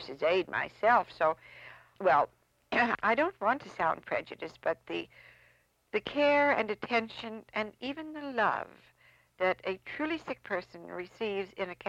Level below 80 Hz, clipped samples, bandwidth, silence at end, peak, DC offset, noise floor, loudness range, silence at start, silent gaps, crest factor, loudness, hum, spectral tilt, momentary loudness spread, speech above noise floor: -68 dBFS; under 0.1%; 9.6 kHz; 0 s; -12 dBFS; under 0.1%; -67 dBFS; 5 LU; 0 s; none; 20 dB; -31 LUFS; none; -5.5 dB/octave; 15 LU; 35 dB